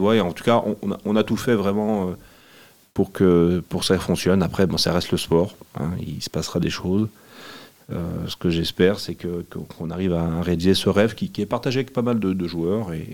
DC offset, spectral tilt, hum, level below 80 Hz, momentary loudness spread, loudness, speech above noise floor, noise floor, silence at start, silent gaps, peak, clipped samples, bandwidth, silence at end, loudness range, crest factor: 0.3%; -6 dB/octave; none; -50 dBFS; 11 LU; -22 LUFS; 29 dB; -51 dBFS; 0 s; none; -2 dBFS; under 0.1%; 17 kHz; 0 s; 5 LU; 20 dB